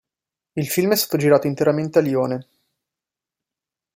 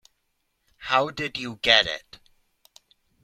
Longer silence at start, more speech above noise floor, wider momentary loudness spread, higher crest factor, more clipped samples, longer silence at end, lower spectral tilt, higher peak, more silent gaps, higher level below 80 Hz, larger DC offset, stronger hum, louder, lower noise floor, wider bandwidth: second, 0.55 s vs 0.8 s; first, 70 dB vs 50 dB; second, 11 LU vs 15 LU; second, 18 dB vs 26 dB; neither; first, 1.55 s vs 1.25 s; first, -5 dB/octave vs -2.5 dB/octave; about the same, -4 dBFS vs -2 dBFS; neither; about the same, -64 dBFS vs -60 dBFS; neither; neither; first, -19 LUFS vs -22 LUFS; first, -88 dBFS vs -74 dBFS; about the same, 16 kHz vs 15.5 kHz